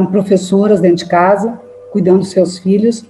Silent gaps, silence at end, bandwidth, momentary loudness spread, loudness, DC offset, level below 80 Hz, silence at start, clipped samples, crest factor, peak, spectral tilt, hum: none; 0.1 s; 11.5 kHz; 8 LU; -12 LUFS; under 0.1%; -56 dBFS; 0 s; under 0.1%; 12 dB; 0 dBFS; -7 dB/octave; none